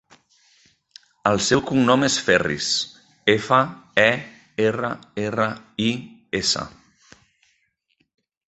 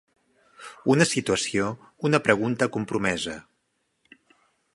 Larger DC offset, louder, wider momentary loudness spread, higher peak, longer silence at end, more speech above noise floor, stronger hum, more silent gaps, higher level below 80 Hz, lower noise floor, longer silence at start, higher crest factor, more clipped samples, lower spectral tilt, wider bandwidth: neither; first, -21 LUFS vs -24 LUFS; second, 10 LU vs 13 LU; about the same, 0 dBFS vs -2 dBFS; first, 1.8 s vs 1.35 s; about the same, 48 dB vs 50 dB; neither; neither; about the same, -54 dBFS vs -58 dBFS; second, -69 dBFS vs -74 dBFS; first, 1.25 s vs 0.6 s; about the same, 22 dB vs 24 dB; neither; about the same, -3.5 dB/octave vs -4.5 dB/octave; second, 8.4 kHz vs 11.5 kHz